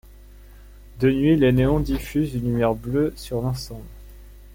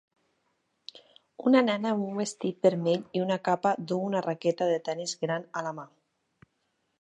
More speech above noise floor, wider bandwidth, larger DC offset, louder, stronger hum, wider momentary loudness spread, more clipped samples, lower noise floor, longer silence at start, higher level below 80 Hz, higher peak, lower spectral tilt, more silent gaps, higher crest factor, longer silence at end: second, 24 dB vs 49 dB; first, 16.5 kHz vs 11 kHz; neither; first, -22 LUFS vs -28 LUFS; first, 50 Hz at -35 dBFS vs none; second, 11 LU vs 14 LU; neither; second, -45 dBFS vs -76 dBFS; second, 0.35 s vs 1.4 s; first, -36 dBFS vs -78 dBFS; about the same, -8 dBFS vs -8 dBFS; first, -7.5 dB/octave vs -5.5 dB/octave; neither; about the same, 16 dB vs 20 dB; second, 0 s vs 1.15 s